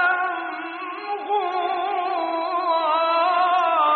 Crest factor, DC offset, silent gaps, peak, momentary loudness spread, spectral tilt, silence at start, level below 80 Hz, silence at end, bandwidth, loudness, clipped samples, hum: 14 dB; under 0.1%; none; -8 dBFS; 11 LU; 3 dB/octave; 0 s; -84 dBFS; 0 s; 4.8 kHz; -22 LUFS; under 0.1%; none